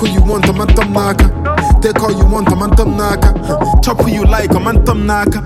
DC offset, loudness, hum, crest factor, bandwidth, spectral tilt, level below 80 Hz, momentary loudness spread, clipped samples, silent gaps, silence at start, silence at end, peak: under 0.1%; -12 LUFS; none; 10 dB; 15.5 kHz; -6.5 dB/octave; -12 dBFS; 2 LU; under 0.1%; none; 0 s; 0 s; 0 dBFS